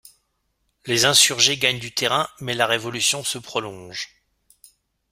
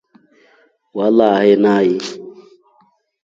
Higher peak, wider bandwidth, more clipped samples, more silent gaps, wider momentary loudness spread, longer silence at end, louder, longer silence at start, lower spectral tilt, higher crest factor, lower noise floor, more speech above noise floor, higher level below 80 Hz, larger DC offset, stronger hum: about the same, 0 dBFS vs 0 dBFS; first, 16 kHz vs 7.8 kHz; neither; neither; about the same, 18 LU vs 17 LU; about the same, 1.05 s vs 0.95 s; second, -19 LUFS vs -14 LUFS; about the same, 0.85 s vs 0.95 s; second, -1 dB/octave vs -6.5 dB/octave; first, 22 dB vs 16 dB; first, -71 dBFS vs -57 dBFS; first, 50 dB vs 44 dB; about the same, -60 dBFS vs -64 dBFS; neither; neither